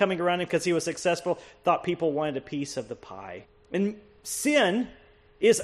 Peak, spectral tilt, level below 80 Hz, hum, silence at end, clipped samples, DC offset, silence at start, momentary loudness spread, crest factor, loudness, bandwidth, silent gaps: -10 dBFS; -4 dB/octave; -62 dBFS; none; 0 s; under 0.1%; under 0.1%; 0 s; 17 LU; 18 dB; -27 LUFS; 13 kHz; none